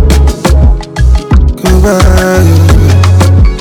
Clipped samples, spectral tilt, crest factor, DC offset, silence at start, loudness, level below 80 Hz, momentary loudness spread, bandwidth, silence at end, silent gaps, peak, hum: 10%; -6.5 dB/octave; 4 dB; under 0.1%; 0 s; -7 LUFS; -8 dBFS; 4 LU; 16 kHz; 0 s; none; 0 dBFS; none